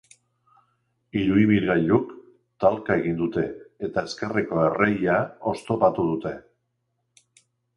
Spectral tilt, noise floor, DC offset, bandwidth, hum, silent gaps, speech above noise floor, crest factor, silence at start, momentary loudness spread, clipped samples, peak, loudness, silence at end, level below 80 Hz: -7.5 dB/octave; -75 dBFS; under 0.1%; 11.5 kHz; none; none; 53 dB; 20 dB; 1.15 s; 11 LU; under 0.1%; -4 dBFS; -24 LUFS; 1.35 s; -54 dBFS